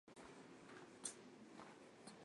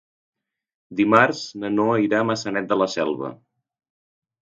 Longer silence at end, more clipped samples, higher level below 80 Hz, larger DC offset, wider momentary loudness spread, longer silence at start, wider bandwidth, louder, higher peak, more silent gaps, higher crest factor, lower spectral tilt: second, 0 s vs 1.05 s; neither; second, -88 dBFS vs -66 dBFS; neither; second, 9 LU vs 13 LU; second, 0.05 s vs 0.9 s; first, 11.5 kHz vs 7.6 kHz; second, -57 LUFS vs -21 LUFS; second, -32 dBFS vs 0 dBFS; neither; about the same, 26 dB vs 24 dB; second, -2.5 dB/octave vs -5.5 dB/octave